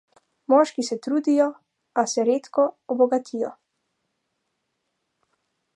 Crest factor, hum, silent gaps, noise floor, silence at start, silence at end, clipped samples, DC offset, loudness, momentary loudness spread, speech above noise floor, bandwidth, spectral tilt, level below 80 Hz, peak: 20 dB; none; none; -77 dBFS; 0.5 s; 2.25 s; under 0.1%; under 0.1%; -23 LUFS; 11 LU; 55 dB; 11.5 kHz; -4 dB/octave; -84 dBFS; -4 dBFS